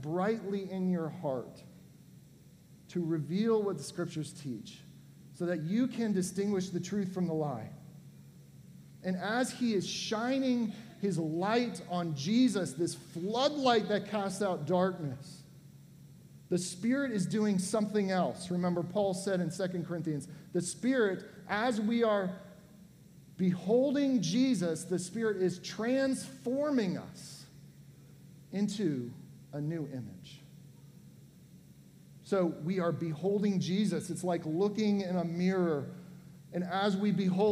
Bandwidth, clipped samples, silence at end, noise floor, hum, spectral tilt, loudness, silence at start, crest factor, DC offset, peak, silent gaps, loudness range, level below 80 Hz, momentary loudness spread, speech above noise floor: 15 kHz; under 0.1%; 0 s; -57 dBFS; none; -6 dB/octave; -33 LUFS; 0 s; 20 dB; under 0.1%; -12 dBFS; none; 6 LU; -72 dBFS; 13 LU; 25 dB